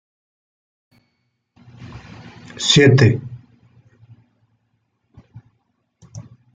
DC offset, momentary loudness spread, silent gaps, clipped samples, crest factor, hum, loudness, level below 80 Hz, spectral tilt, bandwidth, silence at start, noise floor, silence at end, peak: under 0.1%; 29 LU; none; under 0.1%; 20 dB; none; -14 LUFS; -52 dBFS; -5 dB/octave; 9.4 kHz; 1.8 s; -70 dBFS; 0.35 s; -2 dBFS